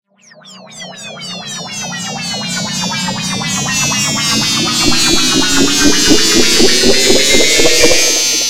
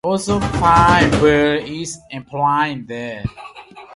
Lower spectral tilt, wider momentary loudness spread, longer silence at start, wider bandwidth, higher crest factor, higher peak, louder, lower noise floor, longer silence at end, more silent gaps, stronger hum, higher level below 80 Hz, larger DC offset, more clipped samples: second, -1.5 dB/octave vs -5.5 dB/octave; second, 14 LU vs 17 LU; about the same, 0 s vs 0.05 s; first, 17 kHz vs 11.5 kHz; about the same, 12 dB vs 16 dB; about the same, 0 dBFS vs 0 dBFS; first, -10 LUFS vs -15 LUFS; about the same, -40 dBFS vs -38 dBFS; about the same, 0 s vs 0 s; neither; neither; about the same, -34 dBFS vs -34 dBFS; neither; neither